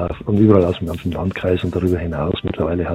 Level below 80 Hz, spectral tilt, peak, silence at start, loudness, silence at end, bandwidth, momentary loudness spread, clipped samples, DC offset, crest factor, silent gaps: -36 dBFS; -8.5 dB/octave; 0 dBFS; 0 s; -18 LUFS; 0 s; 13.5 kHz; 9 LU; under 0.1%; under 0.1%; 18 dB; none